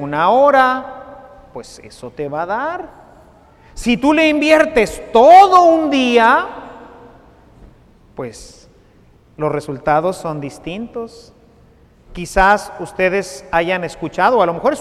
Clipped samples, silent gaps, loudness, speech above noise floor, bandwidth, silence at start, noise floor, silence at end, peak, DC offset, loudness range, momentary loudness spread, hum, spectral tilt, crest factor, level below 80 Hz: under 0.1%; none; -13 LUFS; 34 dB; 14 kHz; 0 s; -49 dBFS; 0 s; 0 dBFS; under 0.1%; 12 LU; 22 LU; none; -5 dB/octave; 16 dB; -40 dBFS